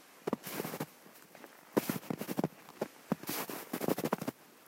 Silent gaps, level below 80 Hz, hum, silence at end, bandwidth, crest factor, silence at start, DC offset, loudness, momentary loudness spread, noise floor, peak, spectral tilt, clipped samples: none; -78 dBFS; none; 0 s; 16.5 kHz; 26 dB; 0 s; under 0.1%; -38 LUFS; 17 LU; -57 dBFS; -14 dBFS; -5 dB/octave; under 0.1%